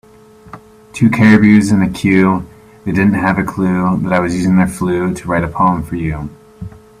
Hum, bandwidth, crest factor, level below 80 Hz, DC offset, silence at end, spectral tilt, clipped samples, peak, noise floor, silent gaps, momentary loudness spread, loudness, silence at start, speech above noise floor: none; 14 kHz; 14 dB; -40 dBFS; under 0.1%; 0.3 s; -7 dB/octave; under 0.1%; 0 dBFS; -41 dBFS; none; 18 LU; -13 LUFS; 0.45 s; 29 dB